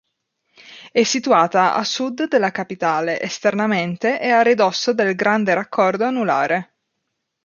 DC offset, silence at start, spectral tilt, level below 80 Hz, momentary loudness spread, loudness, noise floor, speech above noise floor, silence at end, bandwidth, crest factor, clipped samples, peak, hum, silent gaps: under 0.1%; 0.65 s; -4 dB/octave; -70 dBFS; 7 LU; -18 LUFS; -76 dBFS; 58 dB; 0.8 s; 7.4 kHz; 16 dB; under 0.1%; -2 dBFS; none; none